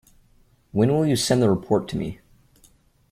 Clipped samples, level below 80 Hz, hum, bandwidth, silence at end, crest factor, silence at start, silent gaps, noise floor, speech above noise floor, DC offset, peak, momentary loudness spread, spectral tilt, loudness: under 0.1%; -52 dBFS; none; 16 kHz; 1 s; 18 dB; 0.75 s; none; -58 dBFS; 38 dB; under 0.1%; -6 dBFS; 11 LU; -6 dB/octave; -22 LUFS